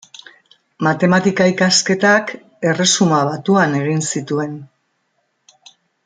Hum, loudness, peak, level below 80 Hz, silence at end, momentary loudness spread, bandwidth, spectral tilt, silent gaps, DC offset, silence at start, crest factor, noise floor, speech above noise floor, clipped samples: none; -15 LUFS; -2 dBFS; -60 dBFS; 1.4 s; 9 LU; 9.6 kHz; -4 dB/octave; none; under 0.1%; 0.8 s; 16 dB; -67 dBFS; 52 dB; under 0.1%